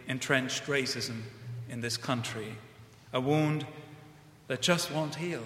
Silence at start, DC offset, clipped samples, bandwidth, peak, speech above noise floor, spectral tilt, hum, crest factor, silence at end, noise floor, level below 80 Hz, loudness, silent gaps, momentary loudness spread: 0 s; under 0.1%; under 0.1%; 16 kHz; -10 dBFS; 22 dB; -4 dB/octave; none; 24 dB; 0 s; -54 dBFS; -68 dBFS; -31 LUFS; none; 15 LU